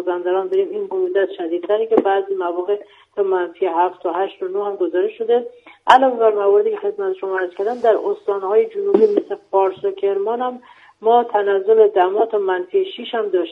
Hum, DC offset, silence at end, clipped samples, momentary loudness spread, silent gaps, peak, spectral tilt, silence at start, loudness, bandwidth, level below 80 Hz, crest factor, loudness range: none; under 0.1%; 0 s; under 0.1%; 9 LU; none; 0 dBFS; -5.5 dB/octave; 0 s; -18 LUFS; 7.4 kHz; -68 dBFS; 18 dB; 3 LU